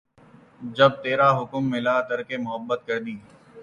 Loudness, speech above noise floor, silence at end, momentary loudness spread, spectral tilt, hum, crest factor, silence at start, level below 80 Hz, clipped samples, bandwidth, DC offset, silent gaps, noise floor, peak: -23 LUFS; 29 dB; 0 s; 16 LU; -6.5 dB/octave; none; 22 dB; 0.6 s; -64 dBFS; under 0.1%; 7.2 kHz; under 0.1%; none; -53 dBFS; -4 dBFS